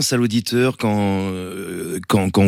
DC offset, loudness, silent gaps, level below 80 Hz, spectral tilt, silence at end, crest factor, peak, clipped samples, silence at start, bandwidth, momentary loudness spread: under 0.1%; -20 LUFS; none; -54 dBFS; -5 dB/octave; 0 s; 14 dB; -4 dBFS; under 0.1%; 0 s; 16.5 kHz; 10 LU